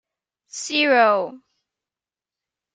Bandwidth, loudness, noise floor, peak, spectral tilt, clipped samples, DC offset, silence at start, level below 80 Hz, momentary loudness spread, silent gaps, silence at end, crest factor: 9.4 kHz; -18 LUFS; under -90 dBFS; -4 dBFS; -2 dB/octave; under 0.1%; under 0.1%; 0.55 s; -80 dBFS; 17 LU; none; 1.35 s; 20 dB